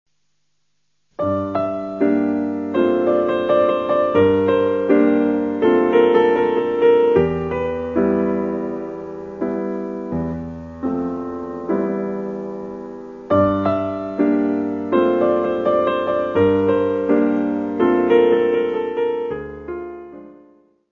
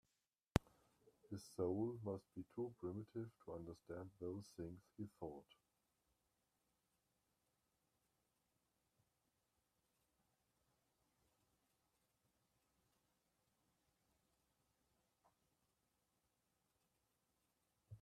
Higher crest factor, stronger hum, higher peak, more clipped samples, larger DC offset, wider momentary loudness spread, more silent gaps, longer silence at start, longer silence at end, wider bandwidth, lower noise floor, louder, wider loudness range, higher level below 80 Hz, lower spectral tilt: second, 16 dB vs 40 dB; neither; first, -2 dBFS vs -14 dBFS; neither; neither; about the same, 14 LU vs 12 LU; neither; first, 1.2 s vs 0.55 s; first, 0.6 s vs 0.05 s; second, 6.2 kHz vs 13.5 kHz; second, -73 dBFS vs under -90 dBFS; first, -19 LUFS vs -50 LUFS; second, 9 LU vs 13 LU; first, -50 dBFS vs -70 dBFS; first, -9 dB/octave vs -7 dB/octave